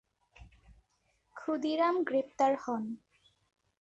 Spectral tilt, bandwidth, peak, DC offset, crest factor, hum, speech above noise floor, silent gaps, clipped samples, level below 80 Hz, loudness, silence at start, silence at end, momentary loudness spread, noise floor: -5 dB/octave; 8.2 kHz; -16 dBFS; under 0.1%; 18 dB; none; 44 dB; none; under 0.1%; -66 dBFS; -32 LUFS; 0.4 s; 0.85 s; 14 LU; -75 dBFS